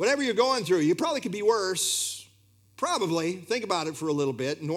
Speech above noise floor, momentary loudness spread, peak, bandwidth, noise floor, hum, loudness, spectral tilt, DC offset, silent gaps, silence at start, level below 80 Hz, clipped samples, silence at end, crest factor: 34 dB; 7 LU; -10 dBFS; 16.5 kHz; -61 dBFS; none; -27 LUFS; -3.5 dB/octave; under 0.1%; none; 0 s; -78 dBFS; under 0.1%; 0 s; 18 dB